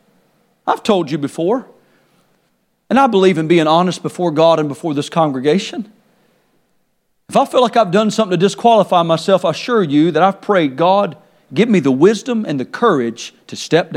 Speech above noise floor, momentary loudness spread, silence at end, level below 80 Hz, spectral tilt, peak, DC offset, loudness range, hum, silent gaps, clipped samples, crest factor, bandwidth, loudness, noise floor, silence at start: 50 dB; 10 LU; 0 s; -66 dBFS; -6 dB/octave; 0 dBFS; under 0.1%; 4 LU; none; none; under 0.1%; 16 dB; 14 kHz; -15 LUFS; -63 dBFS; 0.65 s